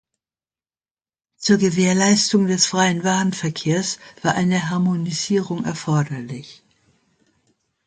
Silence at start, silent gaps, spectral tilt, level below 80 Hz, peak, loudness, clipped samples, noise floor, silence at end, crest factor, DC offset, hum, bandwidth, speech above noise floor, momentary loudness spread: 1.4 s; none; -4.5 dB/octave; -60 dBFS; -2 dBFS; -19 LUFS; under 0.1%; under -90 dBFS; 1.35 s; 18 dB; under 0.1%; none; 9.4 kHz; over 71 dB; 10 LU